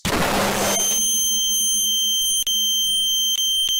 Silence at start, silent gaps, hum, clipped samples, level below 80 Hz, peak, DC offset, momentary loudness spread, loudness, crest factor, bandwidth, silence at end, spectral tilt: 0.05 s; none; none; under 0.1%; -44 dBFS; -10 dBFS; under 0.1%; 3 LU; -17 LUFS; 10 dB; 17 kHz; 0 s; -0.5 dB/octave